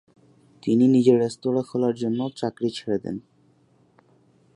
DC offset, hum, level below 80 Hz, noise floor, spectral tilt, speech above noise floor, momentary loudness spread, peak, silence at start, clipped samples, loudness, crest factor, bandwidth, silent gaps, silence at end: under 0.1%; none; -66 dBFS; -60 dBFS; -7.5 dB/octave; 38 dB; 12 LU; -4 dBFS; 0.65 s; under 0.1%; -23 LUFS; 20 dB; 10.5 kHz; none; 1.35 s